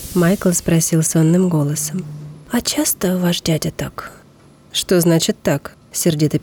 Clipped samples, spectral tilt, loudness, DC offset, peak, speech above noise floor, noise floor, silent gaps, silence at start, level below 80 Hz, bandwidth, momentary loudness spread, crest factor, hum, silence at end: under 0.1%; -5 dB/octave; -17 LUFS; under 0.1%; -6 dBFS; 30 dB; -47 dBFS; none; 0 s; -44 dBFS; over 20 kHz; 13 LU; 12 dB; none; 0 s